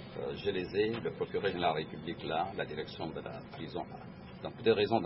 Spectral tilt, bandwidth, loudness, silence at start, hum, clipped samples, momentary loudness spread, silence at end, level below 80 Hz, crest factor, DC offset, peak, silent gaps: -9 dB/octave; 5.8 kHz; -36 LUFS; 0 s; none; under 0.1%; 14 LU; 0 s; -62 dBFS; 20 dB; under 0.1%; -14 dBFS; none